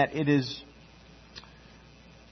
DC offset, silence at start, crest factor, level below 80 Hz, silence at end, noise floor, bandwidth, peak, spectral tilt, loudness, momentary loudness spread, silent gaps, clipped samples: under 0.1%; 0 s; 22 dB; -58 dBFS; 0.9 s; -53 dBFS; 6.4 kHz; -10 dBFS; -6.5 dB/octave; -28 LUFS; 27 LU; none; under 0.1%